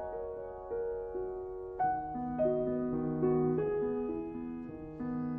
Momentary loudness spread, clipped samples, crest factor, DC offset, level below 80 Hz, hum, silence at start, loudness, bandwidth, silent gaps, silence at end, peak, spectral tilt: 11 LU; under 0.1%; 14 dB; under 0.1%; -56 dBFS; none; 0 s; -35 LUFS; 3.4 kHz; none; 0 s; -20 dBFS; -12 dB/octave